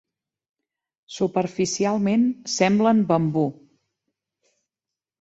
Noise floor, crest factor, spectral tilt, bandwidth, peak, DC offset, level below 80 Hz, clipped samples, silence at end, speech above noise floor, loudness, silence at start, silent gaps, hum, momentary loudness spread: -89 dBFS; 18 dB; -5.5 dB/octave; 8.2 kHz; -6 dBFS; under 0.1%; -64 dBFS; under 0.1%; 1.7 s; 68 dB; -22 LUFS; 1.1 s; none; none; 7 LU